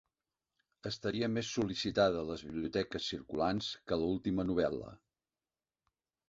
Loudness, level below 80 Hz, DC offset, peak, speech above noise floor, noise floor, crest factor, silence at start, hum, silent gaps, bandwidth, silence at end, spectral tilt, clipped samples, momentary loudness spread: -35 LUFS; -60 dBFS; under 0.1%; -16 dBFS; over 55 dB; under -90 dBFS; 20 dB; 0.85 s; none; none; 8 kHz; 1.35 s; -4.5 dB/octave; under 0.1%; 9 LU